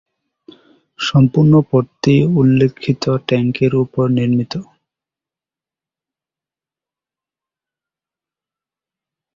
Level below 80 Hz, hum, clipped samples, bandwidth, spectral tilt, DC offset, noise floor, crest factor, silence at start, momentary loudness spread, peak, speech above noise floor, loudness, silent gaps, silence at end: -52 dBFS; none; under 0.1%; 7.4 kHz; -7.5 dB/octave; under 0.1%; -89 dBFS; 16 dB; 1 s; 7 LU; -2 dBFS; 76 dB; -15 LUFS; none; 4.75 s